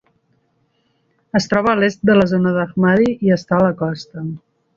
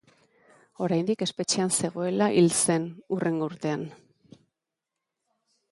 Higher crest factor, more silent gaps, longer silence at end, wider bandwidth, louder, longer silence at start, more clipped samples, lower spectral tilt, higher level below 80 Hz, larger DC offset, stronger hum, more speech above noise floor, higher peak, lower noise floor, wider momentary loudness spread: about the same, 16 dB vs 18 dB; neither; second, 0.4 s vs 1.8 s; second, 7.4 kHz vs 11.5 kHz; first, -16 LUFS vs -26 LUFS; first, 1.35 s vs 0.8 s; neither; first, -7 dB/octave vs -4.5 dB/octave; first, -52 dBFS vs -72 dBFS; neither; neither; second, 48 dB vs 61 dB; first, -2 dBFS vs -10 dBFS; second, -64 dBFS vs -86 dBFS; first, 14 LU vs 11 LU